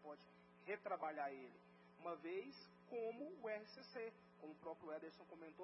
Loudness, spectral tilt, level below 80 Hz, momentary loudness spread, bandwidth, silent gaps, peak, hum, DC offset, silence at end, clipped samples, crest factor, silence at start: -52 LUFS; -3.5 dB/octave; under -90 dBFS; 14 LU; 5.6 kHz; none; -34 dBFS; none; under 0.1%; 0 s; under 0.1%; 18 dB; 0 s